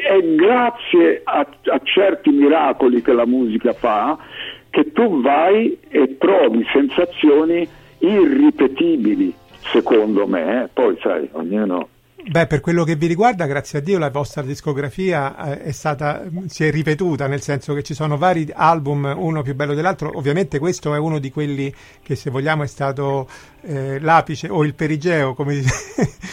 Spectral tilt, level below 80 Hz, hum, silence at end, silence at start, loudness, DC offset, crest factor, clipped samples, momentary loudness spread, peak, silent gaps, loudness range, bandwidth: -6.5 dB/octave; -48 dBFS; none; 0 s; 0 s; -18 LUFS; under 0.1%; 16 dB; under 0.1%; 10 LU; 0 dBFS; none; 6 LU; 14 kHz